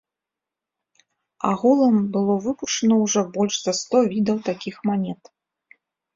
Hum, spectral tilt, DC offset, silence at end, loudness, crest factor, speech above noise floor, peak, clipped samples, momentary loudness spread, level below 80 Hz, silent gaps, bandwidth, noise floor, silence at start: none; -5 dB/octave; under 0.1%; 1 s; -21 LUFS; 16 dB; 66 dB; -6 dBFS; under 0.1%; 9 LU; -64 dBFS; none; 7.6 kHz; -87 dBFS; 1.45 s